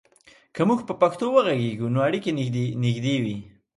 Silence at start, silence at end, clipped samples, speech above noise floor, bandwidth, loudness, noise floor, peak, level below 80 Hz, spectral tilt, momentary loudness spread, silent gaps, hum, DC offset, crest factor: 0.55 s; 0.3 s; under 0.1%; 33 dB; 11.5 kHz; -24 LUFS; -56 dBFS; -6 dBFS; -62 dBFS; -7 dB/octave; 6 LU; none; none; under 0.1%; 18 dB